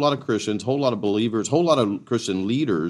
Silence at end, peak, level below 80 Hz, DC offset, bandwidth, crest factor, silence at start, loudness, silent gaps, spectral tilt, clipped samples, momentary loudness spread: 0 s; -4 dBFS; -68 dBFS; under 0.1%; 11.5 kHz; 16 dB; 0 s; -22 LUFS; none; -5.5 dB/octave; under 0.1%; 5 LU